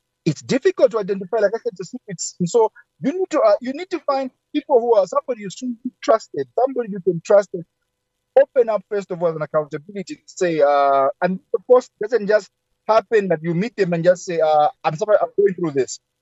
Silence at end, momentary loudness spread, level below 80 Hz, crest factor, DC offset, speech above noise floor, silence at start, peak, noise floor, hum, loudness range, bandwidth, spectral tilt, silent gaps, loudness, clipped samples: 0.25 s; 12 LU; -72 dBFS; 16 dB; under 0.1%; 56 dB; 0.25 s; -4 dBFS; -75 dBFS; none; 3 LU; 8.2 kHz; -5.5 dB/octave; none; -19 LUFS; under 0.1%